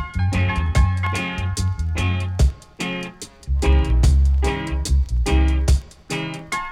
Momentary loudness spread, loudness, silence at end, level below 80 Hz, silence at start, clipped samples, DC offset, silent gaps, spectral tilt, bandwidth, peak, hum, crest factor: 10 LU; -21 LUFS; 0 s; -20 dBFS; 0 s; under 0.1%; under 0.1%; none; -5.5 dB/octave; 12 kHz; -4 dBFS; none; 14 dB